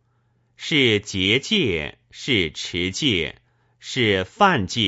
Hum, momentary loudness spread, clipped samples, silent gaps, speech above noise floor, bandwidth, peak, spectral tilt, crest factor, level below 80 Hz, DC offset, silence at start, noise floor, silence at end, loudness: none; 13 LU; under 0.1%; none; 44 dB; 8 kHz; -4 dBFS; -4 dB/octave; 20 dB; -50 dBFS; under 0.1%; 0.6 s; -65 dBFS; 0 s; -20 LUFS